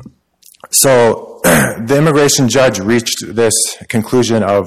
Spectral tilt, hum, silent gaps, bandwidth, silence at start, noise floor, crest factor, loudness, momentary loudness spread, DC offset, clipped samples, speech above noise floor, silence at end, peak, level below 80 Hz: -4 dB/octave; none; none; 16.5 kHz; 0 s; -47 dBFS; 12 dB; -11 LUFS; 6 LU; 0.6%; under 0.1%; 35 dB; 0 s; 0 dBFS; -42 dBFS